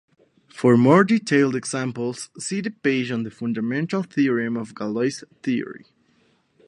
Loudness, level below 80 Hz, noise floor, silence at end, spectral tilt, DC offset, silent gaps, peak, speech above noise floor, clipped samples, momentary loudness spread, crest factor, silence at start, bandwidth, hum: -22 LUFS; -68 dBFS; -62 dBFS; 0.9 s; -6 dB/octave; under 0.1%; none; -2 dBFS; 41 dB; under 0.1%; 12 LU; 20 dB; 0.55 s; 11 kHz; none